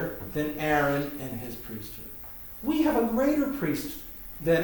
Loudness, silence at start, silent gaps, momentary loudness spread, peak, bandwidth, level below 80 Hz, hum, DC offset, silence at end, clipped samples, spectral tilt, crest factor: -29 LUFS; 0 s; none; 14 LU; -12 dBFS; over 20 kHz; -50 dBFS; none; under 0.1%; 0 s; under 0.1%; -6 dB/octave; 16 dB